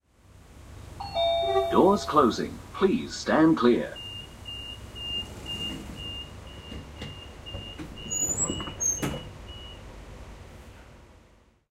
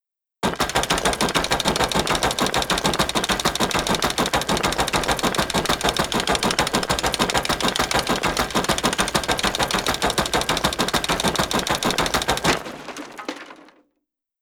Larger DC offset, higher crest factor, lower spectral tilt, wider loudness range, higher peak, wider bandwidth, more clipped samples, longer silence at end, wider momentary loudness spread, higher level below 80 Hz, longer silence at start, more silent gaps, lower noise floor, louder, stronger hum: neither; about the same, 22 dB vs 20 dB; about the same, -3.5 dB/octave vs -2.5 dB/octave; first, 12 LU vs 1 LU; second, -6 dBFS vs -2 dBFS; second, 16 kHz vs over 20 kHz; neither; second, 0.6 s vs 0.75 s; first, 24 LU vs 2 LU; second, -48 dBFS vs -38 dBFS; about the same, 0.35 s vs 0.45 s; neither; second, -59 dBFS vs -78 dBFS; second, -26 LUFS vs -21 LUFS; neither